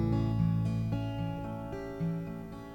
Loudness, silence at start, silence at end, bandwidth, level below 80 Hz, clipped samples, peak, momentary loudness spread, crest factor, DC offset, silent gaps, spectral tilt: -34 LUFS; 0 s; 0 s; 7.6 kHz; -46 dBFS; under 0.1%; -18 dBFS; 10 LU; 16 dB; under 0.1%; none; -9 dB/octave